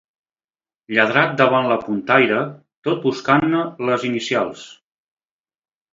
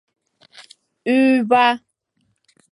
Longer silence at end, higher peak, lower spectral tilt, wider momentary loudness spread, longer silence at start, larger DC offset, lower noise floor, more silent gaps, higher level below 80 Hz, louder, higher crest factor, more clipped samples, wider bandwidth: first, 1.2 s vs 0.95 s; about the same, 0 dBFS vs -2 dBFS; about the same, -5.5 dB/octave vs -5 dB/octave; second, 9 LU vs 14 LU; first, 0.9 s vs 0.6 s; neither; first, under -90 dBFS vs -68 dBFS; first, 2.77-2.82 s vs none; first, -62 dBFS vs -70 dBFS; about the same, -18 LUFS vs -17 LUFS; about the same, 20 dB vs 18 dB; neither; second, 7.8 kHz vs 11.5 kHz